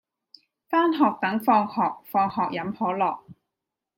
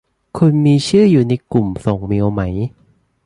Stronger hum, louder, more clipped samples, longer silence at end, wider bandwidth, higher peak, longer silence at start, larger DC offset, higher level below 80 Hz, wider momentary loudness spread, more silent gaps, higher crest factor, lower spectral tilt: neither; second, -24 LUFS vs -15 LUFS; neither; about the same, 0.65 s vs 0.55 s; first, 16.5 kHz vs 11.5 kHz; second, -8 dBFS vs 0 dBFS; first, 0.7 s vs 0.35 s; neither; second, -70 dBFS vs -40 dBFS; second, 6 LU vs 11 LU; neither; about the same, 18 dB vs 14 dB; about the same, -7 dB/octave vs -7.5 dB/octave